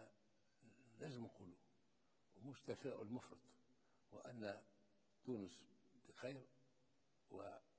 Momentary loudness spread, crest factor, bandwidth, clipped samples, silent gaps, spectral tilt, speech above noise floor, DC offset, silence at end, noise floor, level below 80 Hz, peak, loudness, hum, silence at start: 14 LU; 22 dB; 8 kHz; under 0.1%; none; -6 dB/octave; 29 dB; under 0.1%; 0.15 s; -83 dBFS; -86 dBFS; -34 dBFS; -55 LUFS; none; 0 s